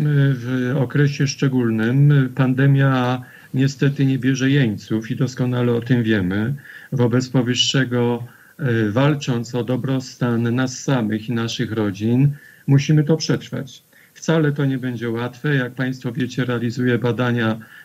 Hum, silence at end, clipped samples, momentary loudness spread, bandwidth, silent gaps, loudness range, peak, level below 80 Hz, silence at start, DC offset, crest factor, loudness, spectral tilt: none; 0.05 s; under 0.1%; 8 LU; 14 kHz; none; 4 LU; -4 dBFS; -64 dBFS; 0 s; under 0.1%; 14 dB; -19 LUFS; -6.5 dB/octave